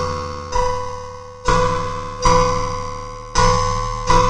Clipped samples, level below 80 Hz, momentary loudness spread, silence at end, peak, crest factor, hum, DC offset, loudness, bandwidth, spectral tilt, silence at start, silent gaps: under 0.1%; -26 dBFS; 13 LU; 0 s; 0 dBFS; 18 dB; none; under 0.1%; -20 LUFS; 11 kHz; -4 dB/octave; 0 s; none